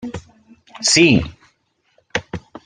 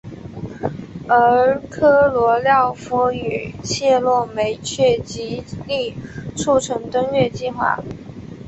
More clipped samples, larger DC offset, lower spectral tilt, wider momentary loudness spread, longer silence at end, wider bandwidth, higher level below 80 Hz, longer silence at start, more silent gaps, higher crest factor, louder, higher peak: neither; neither; about the same, -3.5 dB/octave vs -4.5 dB/octave; first, 21 LU vs 16 LU; about the same, 0.05 s vs 0 s; first, 10 kHz vs 8.2 kHz; about the same, -44 dBFS vs -46 dBFS; about the same, 0 s vs 0.05 s; neither; about the same, 18 dB vs 16 dB; about the same, -16 LUFS vs -18 LUFS; about the same, -2 dBFS vs -2 dBFS